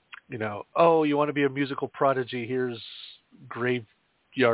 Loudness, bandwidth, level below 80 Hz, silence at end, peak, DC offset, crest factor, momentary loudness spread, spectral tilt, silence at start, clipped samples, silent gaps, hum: -26 LUFS; 4 kHz; -72 dBFS; 0 s; -8 dBFS; under 0.1%; 20 dB; 18 LU; -10 dB/octave; 0.3 s; under 0.1%; none; none